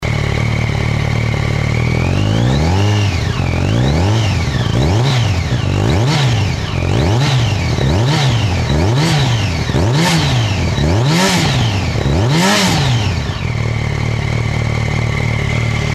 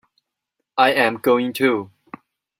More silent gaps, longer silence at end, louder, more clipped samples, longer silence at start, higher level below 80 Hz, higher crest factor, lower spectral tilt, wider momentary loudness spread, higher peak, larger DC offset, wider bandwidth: neither; second, 0 s vs 0.75 s; first, -14 LUFS vs -19 LUFS; neither; second, 0 s vs 0.75 s; first, -26 dBFS vs -66 dBFS; second, 12 dB vs 20 dB; about the same, -5.5 dB/octave vs -4.5 dB/octave; second, 5 LU vs 12 LU; about the same, -2 dBFS vs -2 dBFS; neither; second, 13.5 kHz vs 16 kHz